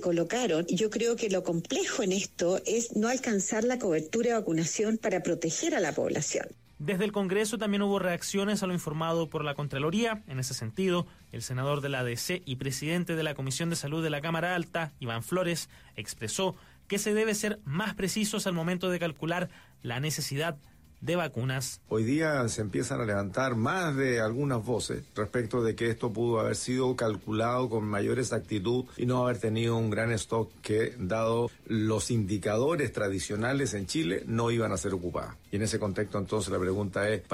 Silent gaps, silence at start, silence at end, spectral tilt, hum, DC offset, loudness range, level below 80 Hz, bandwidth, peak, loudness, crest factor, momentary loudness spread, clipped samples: none; 0 s; 0 s; -5 dB/octave; none; under 0.1%; 3 LU; -58 dBFS; 16 kHz; -18 dBFS; -30 LUFS; 12 dB; 5 LU; under 0.1%